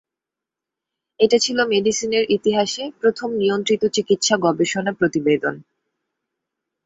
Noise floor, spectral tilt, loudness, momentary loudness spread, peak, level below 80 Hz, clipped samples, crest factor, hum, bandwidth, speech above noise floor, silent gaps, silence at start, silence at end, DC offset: -86 dBFS; -3.5 dB/octave; -19 LUFS; 4 LU; -2 dBFS; -62 dBFS; under 0.1%; 18 dB; none; 8 kHz; 68 dB; none; 1.2 s; 1.25 s; under 0.1%